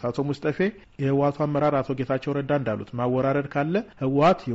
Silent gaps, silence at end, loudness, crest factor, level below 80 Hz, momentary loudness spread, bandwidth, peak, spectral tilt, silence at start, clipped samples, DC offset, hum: none; 0 s; -25 LUFS; 14 dB; -56 dBFS; 7 LU; 7.8 kHz; -10 dBFS; -6.5 dB/octave; 0 s; under 0.1%; under 0.1%; none